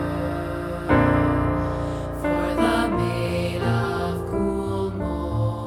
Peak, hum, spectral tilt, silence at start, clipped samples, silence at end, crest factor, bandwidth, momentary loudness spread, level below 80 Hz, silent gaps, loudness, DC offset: -6 dBFS; none; -7.5 dB/octave; 0 s; under 0.1%; 0 s; 16 dB; 15.5 kHz; 8 LU; -36 dBFS; none; -24 LUFS; under 0.1%